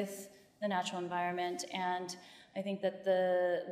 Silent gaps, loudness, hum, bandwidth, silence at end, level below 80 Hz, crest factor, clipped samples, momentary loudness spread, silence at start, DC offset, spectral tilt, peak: none; -36 LUFS; none; 15 kHz; 0 s; -86 dBFS; 16 dB; under 0.1%; 14 LU; 0 s; under 0.1%; -4.5 dB/octave; -20 dBFS